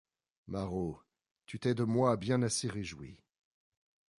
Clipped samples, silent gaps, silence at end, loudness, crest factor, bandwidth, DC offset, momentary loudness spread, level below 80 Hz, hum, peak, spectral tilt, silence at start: under 0.1%; 1.31-1.35 s; 1.05 s; -34 LUFS; 22 dB; 11.5 kHz; under 0.1%; 19 LU; -60 dBFS; none; -14 dBFS; -5.5 dB/octave; 0.45 s